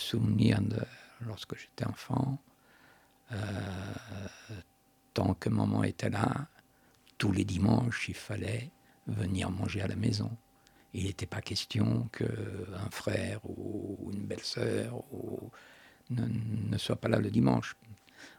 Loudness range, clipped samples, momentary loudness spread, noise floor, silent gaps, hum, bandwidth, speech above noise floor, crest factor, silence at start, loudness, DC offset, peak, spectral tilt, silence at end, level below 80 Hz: 7 LU; under 0.1%; 16 LU; -64 dBFS; none; none; 16 kHz; 32 dB; 24 dB; 0 s; -34 LUFS; under 0.1%; -8 dBFS; -6.5 dB/octave; 0.05 s; -58 dBFS